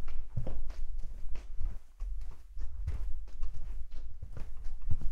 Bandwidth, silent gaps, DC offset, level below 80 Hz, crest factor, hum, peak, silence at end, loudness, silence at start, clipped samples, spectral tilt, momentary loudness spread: 2.1 kHz; none; under 0.1%; -36 dBFS; 14 dB; none; -14 dBFS; 0 s; -45 LUFS; 0 s; under 0.1%; -7.5 dB/octave; 7 LU